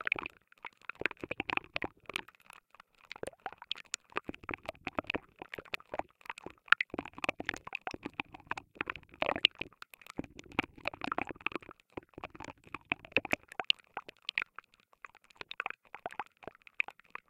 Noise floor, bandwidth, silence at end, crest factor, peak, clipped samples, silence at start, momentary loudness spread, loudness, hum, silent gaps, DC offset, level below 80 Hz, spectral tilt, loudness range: -62 dBFS; 16.5 kHz; 0.4 s; 36 dB; -4 dBFS; under 0.1%; 0 s; 18 LU; -37 LUFS; none; none; under 0.1%; -66 dBFS; -2.5 dB/octave; 6 LU